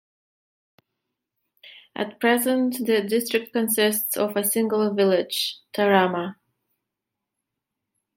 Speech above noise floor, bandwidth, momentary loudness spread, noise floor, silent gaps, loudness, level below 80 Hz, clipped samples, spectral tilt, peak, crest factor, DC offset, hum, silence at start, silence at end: 62 dB; 16.5 kHz; 8 LU; -84 dBFS; none; -22 LUFS; -76 dBFS; under 0.1%; -3.5 dB/octave; -4 dBFS; 22 dB; under 0.1%; none; 1.65 s; 1.85 s